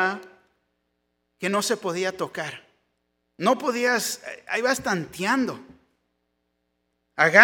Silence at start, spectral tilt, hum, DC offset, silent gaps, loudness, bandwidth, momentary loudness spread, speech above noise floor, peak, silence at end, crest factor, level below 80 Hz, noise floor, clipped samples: 0 s; -3.5 dB/octave; none; under 0.1%; none; -25 LUFS; 18 kHz; 12 LU; 52 dB; 0 dBFS; 0 s; 26 dB; -68 dBFS; -75 dBFS; under 0.1%